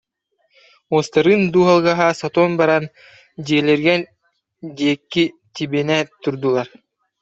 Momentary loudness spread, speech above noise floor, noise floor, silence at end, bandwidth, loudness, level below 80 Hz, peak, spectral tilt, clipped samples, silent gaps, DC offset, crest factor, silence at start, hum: 16 LU; 51 dB; -68 dBFS; 0.55 s; 8 kHz; -17 LUFS; -60 dBFS; -2 dBFS; -6 dB/octave; under 0.1%; none; under 0.1%; 16 dB; 0.9 s; none